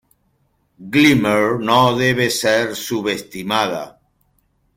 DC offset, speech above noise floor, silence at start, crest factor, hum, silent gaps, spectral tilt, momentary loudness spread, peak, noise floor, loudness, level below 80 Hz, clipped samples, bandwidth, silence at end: under 0.1%; 47 dB; 0.8 s; 18 dB; none; none; -4.5 dB/octave; 10 LU; -2 dBFS; -63 dBFS; -16 LUFS; -52 dBFS; under 0.1%; 16.5 kHz; 0.85 s